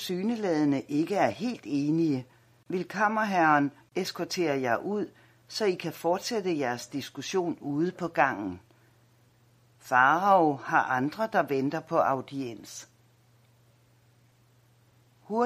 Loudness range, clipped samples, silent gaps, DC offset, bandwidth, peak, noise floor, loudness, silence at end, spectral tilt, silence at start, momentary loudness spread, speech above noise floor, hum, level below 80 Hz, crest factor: 6 LU; under 0.1%; none; under 0.1%; 15.5 kHz; -8 dBFS; -63 dBFS; -28 LUFS; 0 s; -5 dB/octave; 0 s; 13 LU; 35 dB; none; -74 dBFS; 22 dB